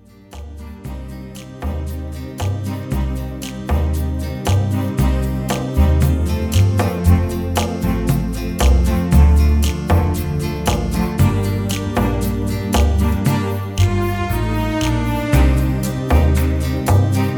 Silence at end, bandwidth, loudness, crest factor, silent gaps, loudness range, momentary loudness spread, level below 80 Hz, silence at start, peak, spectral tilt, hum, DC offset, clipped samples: 0 s; over 20 kHz; -18 LUFS; 16 dB; none; 7 LU; 12 LU; -20 dBFS; 0.3 s; -2 dBFS; -6.5 dB/octave; none; under 0.1%; under 0.1%